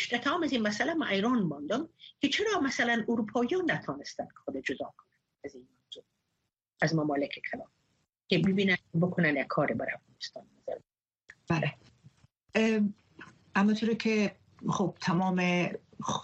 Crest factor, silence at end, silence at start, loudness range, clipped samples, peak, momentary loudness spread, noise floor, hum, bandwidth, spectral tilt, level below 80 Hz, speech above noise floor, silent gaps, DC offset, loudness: 18 dB; 0 s; 0 s; 6 LU; under 0.1%; -12 dBFS; 15 LU; -83 dBFS; none; 8.2 kHz; -5.5 dB/octave; -68 dBFS; 53 dB; none; under 0.1%; -30 LUFS